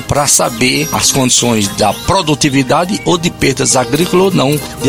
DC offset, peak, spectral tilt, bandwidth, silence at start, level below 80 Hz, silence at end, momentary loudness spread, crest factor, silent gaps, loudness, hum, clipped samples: 0.4%; -2 dBFS; -3.5 dB/octave; over 20 kHz; 0 s; -36 dBFS; 0 s; 4 LU; 10 dB; none; -11 LUFS; none; under 0.1%